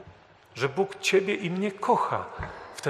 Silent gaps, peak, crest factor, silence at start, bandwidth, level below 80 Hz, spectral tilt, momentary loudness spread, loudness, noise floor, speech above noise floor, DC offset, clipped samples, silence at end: none; -10 dBFS; 18 dB; 0 s; 13 kHz; -54 dBFS; -4.5 dB/octave; 14 LU; -27 LUFS; -53 dBFS; 26 dB; under 0.1%; under 0.1%; 0 s